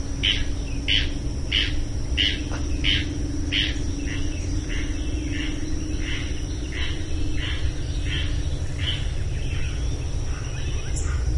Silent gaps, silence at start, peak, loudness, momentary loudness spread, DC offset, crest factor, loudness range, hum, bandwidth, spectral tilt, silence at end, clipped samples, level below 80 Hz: none; 0 s; -6 dBFS; -26 LUFS; 8 LU; under 0.1%; 18 dB; 5 LU; none; 11.5 kHz; -4 dB/octave; 0 s; under 0.1%; -28 dBFS